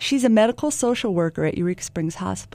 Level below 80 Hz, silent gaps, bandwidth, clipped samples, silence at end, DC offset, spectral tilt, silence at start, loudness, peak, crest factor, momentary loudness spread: -52 dBFS; none; 15.5 kHz; under 0.1%; 0.05 s; under 0.1%; -5 dB/octave; 0 s; -22 LUFS; -4 dBFS; 16 dB; 9 LU